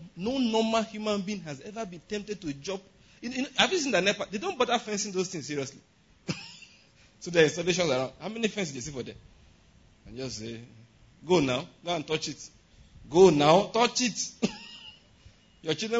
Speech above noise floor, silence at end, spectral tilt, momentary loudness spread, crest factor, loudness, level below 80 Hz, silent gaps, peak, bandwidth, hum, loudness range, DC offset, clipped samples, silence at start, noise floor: 31 dB; 0 s; -4 dB/octave; 19 LU; 22 dB; -28 LUFS; -60 dBFS; none; -6 dBFS; 8 kHz; none; 8 LU; under 0.1%; under 0.1%; 0 s; -59 dBFS